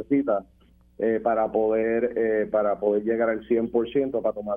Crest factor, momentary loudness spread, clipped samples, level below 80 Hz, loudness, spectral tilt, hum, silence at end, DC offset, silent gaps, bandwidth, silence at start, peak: 14 dB; 3 LU; under 0.1%; -56 dBFS; -24 LUFS; -9.5 dB/octave; none; 0 s; under 0.1%; none; 3.6 kHz; 0 s; -10 dBFS